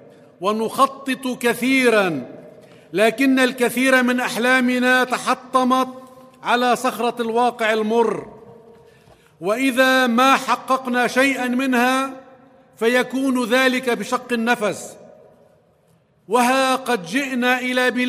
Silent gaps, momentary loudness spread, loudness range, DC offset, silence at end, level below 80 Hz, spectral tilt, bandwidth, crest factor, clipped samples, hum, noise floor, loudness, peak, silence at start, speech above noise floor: none; 9 LU; 4 LU; under 0.1%; 0 s; -70 dBFS; -3.5 dB/octave; 15.5 kHz; 18 dB; under 0.1%; none; -58 dBFS; -18 LUFS; -2 dBFS; 0.4 s; 40 dB